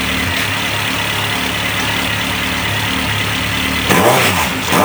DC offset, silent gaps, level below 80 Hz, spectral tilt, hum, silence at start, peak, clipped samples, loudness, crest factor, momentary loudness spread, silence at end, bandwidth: under 0.1%; none; -34 dBFS; -3 dB/octave; none; 0 s; 0 dBFS; under 0.1%; -14 LUFS; 16 dB; 5 LU; 0 s; over 20 kHz